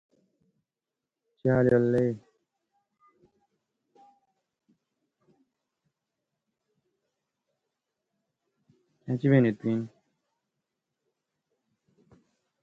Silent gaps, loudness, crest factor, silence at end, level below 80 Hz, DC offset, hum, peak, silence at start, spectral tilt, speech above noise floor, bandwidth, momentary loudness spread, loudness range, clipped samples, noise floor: none; -26 LUFS; 24 dB; 2.75 s; -66 dBFS; under 0.1%; none; -10 dBFS; 1.45 s; -10 dB/octave; 65 dB; 7.4 kHz; 17 LU; 7 LU; under 0.1%; -89 dBFS